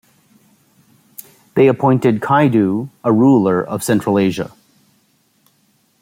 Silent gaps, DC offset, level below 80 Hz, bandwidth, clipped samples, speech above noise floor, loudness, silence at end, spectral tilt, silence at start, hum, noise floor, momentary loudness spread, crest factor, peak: none; under 0.1%; -58 dBFS; 16.5 kHz; under 0.1%; 45 dB; -15 LUFS; 1.55 s; -7 dB/octave; 1.55 s; none; -59 dBFS; 20 LU; 16 dB; -2 dBFS